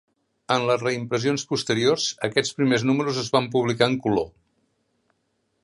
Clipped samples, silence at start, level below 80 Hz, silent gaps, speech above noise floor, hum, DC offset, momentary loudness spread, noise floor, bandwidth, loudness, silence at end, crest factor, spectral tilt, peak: under 0.1%; 0.5 s; -60 dBFS; none; 50 dB; none; under 0.1%; 4 LU; -72 dBFS; 11.5 kHz; -23 LUFS; 1.35 s; 20 dB; -4.5 dB/octave; -4 dBFS